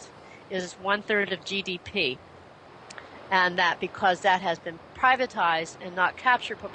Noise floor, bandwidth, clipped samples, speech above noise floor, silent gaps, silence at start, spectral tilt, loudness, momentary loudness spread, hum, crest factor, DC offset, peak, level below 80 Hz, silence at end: -49 dBFS; 9.6 kHz; under 0.1%; 23 dB; none; 0 s; -3.5 dB/octave; -26 LUFS; 17 LU; none; 18 dB; under 0.1%; -8 dBFS; -64 dBFS; 0 s